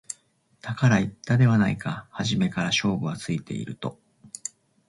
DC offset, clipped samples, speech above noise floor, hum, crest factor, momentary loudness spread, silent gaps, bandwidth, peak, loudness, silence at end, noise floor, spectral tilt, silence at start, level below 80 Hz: under 0.1%; under 0.1%; 40 dB; none; 18 dB; 17 LU; none; 11.5 kHz; -8 dBFS; -25 LUFS; 0.4 s; -64 dBFS; -5.5 dB/octave; 0.1 s; -56 dBFS